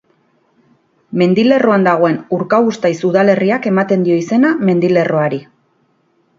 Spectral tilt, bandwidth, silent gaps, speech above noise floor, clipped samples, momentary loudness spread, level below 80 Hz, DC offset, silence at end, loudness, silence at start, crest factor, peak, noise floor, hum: -7.5 dB/octave; 7.6 kHz; none; 46 dB; under 0.1%; 5 LU; -60 dBFS; under 0.1%; 0.95 s; -13 LUFS; 1.1 s; 14 dB; 0 dBFS; -59 dBFS; none